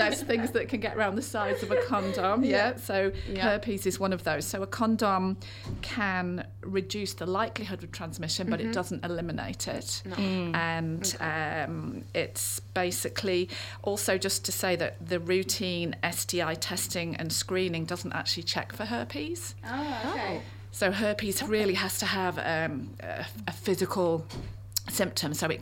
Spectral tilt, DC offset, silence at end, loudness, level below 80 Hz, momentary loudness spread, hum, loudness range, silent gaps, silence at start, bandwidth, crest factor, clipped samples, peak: -4 dB/octave; under 0.1%; 0 s; -30 LUFS; -52 dBFS; 8 LU; none; 4 LU; none; 0 s; 18 kHz; 22 dB; under 0.1%; -10 dBFS